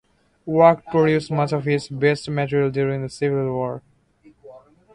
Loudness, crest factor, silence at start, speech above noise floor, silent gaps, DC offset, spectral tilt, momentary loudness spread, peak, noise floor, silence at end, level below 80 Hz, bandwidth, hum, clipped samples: -20 LUFS; 20 dB; 0.45 s; 35 dB; none; under 0.1%; -7 dB/octave; 10 LU; 0 dBFS; -54 dBFS; 0.35 s; -56 dBFS; 11 kHz; none; under 0.1%